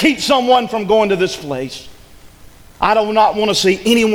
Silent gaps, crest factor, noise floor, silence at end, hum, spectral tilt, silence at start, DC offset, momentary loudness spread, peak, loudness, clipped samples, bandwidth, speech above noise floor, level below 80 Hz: none; 14 dB; -42 dBFS; 0 s; none; -4 dB/octave; 0 s; under 0.1%; 11 LU; 0 dBFS; -14 LUFS; under 0.1%; 19 kHz; 28 dB; -44 dBFS